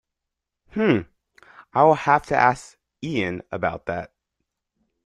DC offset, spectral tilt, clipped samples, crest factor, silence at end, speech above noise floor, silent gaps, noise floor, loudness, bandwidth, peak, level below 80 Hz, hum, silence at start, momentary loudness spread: under 0.1%; -6.5 dB/octave; under 0.1%; 22 dB; 1 s; 63 dB; none; -84 dBFS; -22 LUFS; 11.5 kHz; -2 dBFS; -56 dBFS; none; 0.75 s; 15 LU